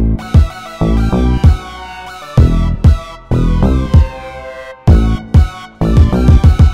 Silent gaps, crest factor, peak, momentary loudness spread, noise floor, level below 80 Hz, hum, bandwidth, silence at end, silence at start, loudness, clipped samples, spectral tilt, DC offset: none; 10 dB; 0 dBFS; 18 LU; -28 dBFS; -14 dBFS; none; 8.6 kHz; 0 s; 0 s; -12 LUFS; 0.5%; -8 dB/octave; under 0.1%